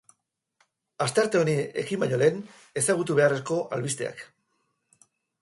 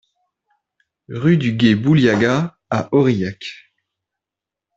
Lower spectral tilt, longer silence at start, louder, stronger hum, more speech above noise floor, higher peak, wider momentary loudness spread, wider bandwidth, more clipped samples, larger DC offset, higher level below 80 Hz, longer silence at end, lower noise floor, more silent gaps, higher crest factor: second, -4.5 dB/octave vs -7 dB/octave; about the same, 1 s vs 1.1 s; second, -26 LUFS vs -17 LUFS; neither; second, 49 dB vs 70 dB; second, -8 dBFS vs -2 dBFS; second, 11 LU vs 15 LU; first, 12 kHz vs 7.8 kHz; neither; neither; second, -70 dBFS vs -54 dBFS; about the same, 1.15 s vs 1.2 s; second, -75 dBFS vs -86 dBFS; neither; about the same, 20 dB vs 18 dB